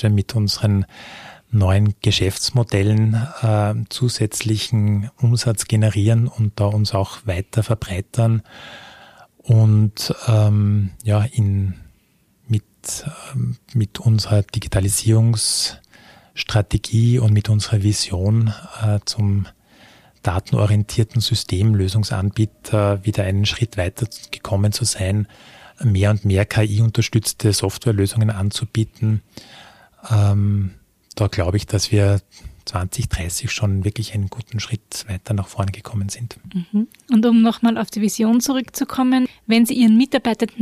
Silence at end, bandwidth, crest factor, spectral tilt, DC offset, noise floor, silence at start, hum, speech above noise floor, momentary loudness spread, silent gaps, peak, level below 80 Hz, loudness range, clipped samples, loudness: 0 s; 14.5 kHz; 16 dB; -5.5 dB/octave; under 0.1%; -59 dBFS; 0 s; none; 41 dB; 10 LU; none; -2 dBFS; -42 dBFS; 4 LU; under 0.1%; -19 LUFS